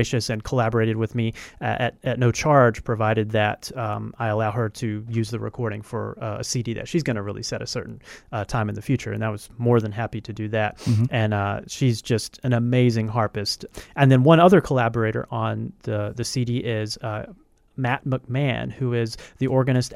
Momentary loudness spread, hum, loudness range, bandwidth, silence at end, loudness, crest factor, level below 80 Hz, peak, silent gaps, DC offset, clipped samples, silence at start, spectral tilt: 12 LU; none; 8 LU; 13.5 kHz; 0 s; -23 LUFS; 22 dB; -50 dBFS; -2 dBFS; none; under 0.1%; under 0.1%; 0 s; -6 dB/octave